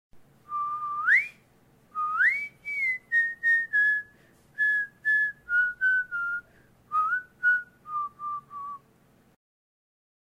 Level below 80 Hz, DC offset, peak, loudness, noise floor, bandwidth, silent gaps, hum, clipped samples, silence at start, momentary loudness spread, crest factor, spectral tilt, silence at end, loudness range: -70 dBFS; under 0.1%; -12 dBFS; -26 LUFS; -61 dBFS; 15.5 kHz; none; none; under 0.1%; 0.15 s; 14 LU; 18 dB; -2 dB/octave; 1.6 s; 6 LU